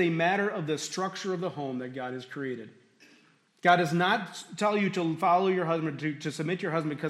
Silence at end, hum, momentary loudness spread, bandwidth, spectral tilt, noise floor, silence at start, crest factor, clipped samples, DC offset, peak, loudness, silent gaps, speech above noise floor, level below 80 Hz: 0 s; none; 12 LU; 14 kHz; -5.5 dB/octave; -63 dBFS; 0 s; 20 dB; under 0.1%; under 0.1%; -10 dBFS; -29 LUFS; none; 34 dB; -78 dBFS